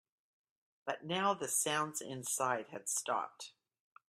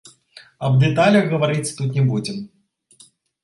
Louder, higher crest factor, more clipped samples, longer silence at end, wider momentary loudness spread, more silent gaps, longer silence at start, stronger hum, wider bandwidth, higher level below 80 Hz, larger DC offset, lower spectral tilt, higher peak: second, -36 LUFS vs -19 LUFS; about the same, 20 dB vs 16 dB; neither; second, 0.6 s vs 0.95 s; about the same, 13 LU vs 14 LU; neither; first, 0.85 s vs 0.6 s; neither; first, 16 kHz vs 11.5 kHz; second, -84 dBFS vs -54 dBFS; neither; second, -2 dB/octave vs -6.5 dB/octave; second, -18 dBFS vs -4 dBFS